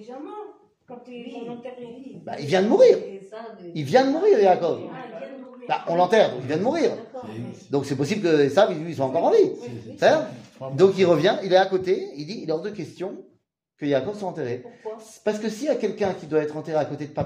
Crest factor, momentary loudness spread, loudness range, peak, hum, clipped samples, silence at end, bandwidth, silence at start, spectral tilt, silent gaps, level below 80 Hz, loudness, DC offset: 20 dB; 19 LU; 7 LU; -4 dBFS; none; under 0.1%; 0 s; 11.5 kHz; 0 s; -6 dB/octave; none; -68 dBFS; -22 LUFS; under 0.1%